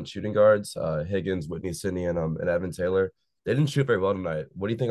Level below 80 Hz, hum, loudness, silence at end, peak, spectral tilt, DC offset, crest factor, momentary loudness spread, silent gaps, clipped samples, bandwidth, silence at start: -48 dBFS; none; -26 LUFS; 0 s; -10 dBFS; -6.5 dB/octave; under 0.1%; 16 dB; 10 LU; none; under 0.1%; 12.5 kHz; 0 s